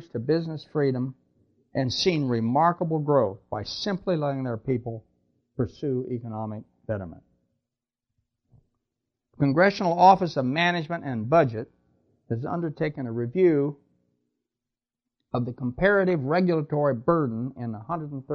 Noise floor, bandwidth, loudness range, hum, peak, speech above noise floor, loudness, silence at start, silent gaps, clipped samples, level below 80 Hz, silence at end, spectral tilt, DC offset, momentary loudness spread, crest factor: -89 dBFS; 6.8 kHz; 11 LU; none; -4 dBFS; 64 dB; -25 LUFS; 0 s; none; under 0.1%; -58 dBFS; 0 s; -7 dB/octave; under 0.1%; 13 LU; 22 dB